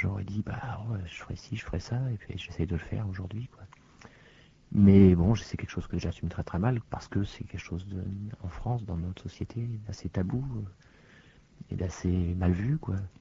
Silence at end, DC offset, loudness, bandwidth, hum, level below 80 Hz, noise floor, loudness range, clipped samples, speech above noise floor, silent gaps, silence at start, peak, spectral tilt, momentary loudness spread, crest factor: 0.1 s; under 0.1%; -30 LUFS; 7.6 kHz; none; -46 dBFS; -57 dBFS; 10 LU; under 0.1%; 28 dB; none; 0 s; -8 dBFS; -8 dB/octave; 14 LU; 22 dB